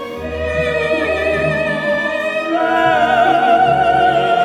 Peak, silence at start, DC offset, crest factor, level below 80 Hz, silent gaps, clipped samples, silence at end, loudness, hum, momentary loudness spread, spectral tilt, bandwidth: -2 dBFS; 0 s; under 0.1%; 12 dB; -38 dBFS; none; under 0.1%; 0 s; -15 LUFS; none; 6 LU; -5.5 dB/octave; 12 kHz